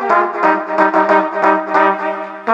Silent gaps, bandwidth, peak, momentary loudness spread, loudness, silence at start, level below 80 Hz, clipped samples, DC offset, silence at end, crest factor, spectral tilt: none; 8.2 kHz; 0 dBFS; 7 LU; -14 LUFS; 0 s; -70 dBFS; under 0.1%; under 0.1%; 0 s; 14 dB; -6 dB/octave